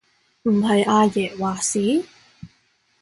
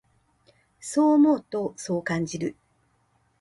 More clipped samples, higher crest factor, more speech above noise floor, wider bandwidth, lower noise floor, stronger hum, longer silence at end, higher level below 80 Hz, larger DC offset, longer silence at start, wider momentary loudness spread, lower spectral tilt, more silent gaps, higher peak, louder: neither; about the same, 16 dB vs 16 dB; about the same, 44 dB vs 44 dB; about the same, 11.5 kHz vs 11.5 kHz; second, -63 dBFS vs -67 dBFS; neither; second, 0.55 s vs 0.9 s; first, -58 dBFS vs -64 dBFS; neither; second, 0.45 s vs 0.85 s; second, 8 LU vs 14 LU; second, -4.5 dB/octave vs -6 dB/octave; neither; first, -6 dBFS vs -10 dBFS; first, -20 LUFS vs -24 LUFS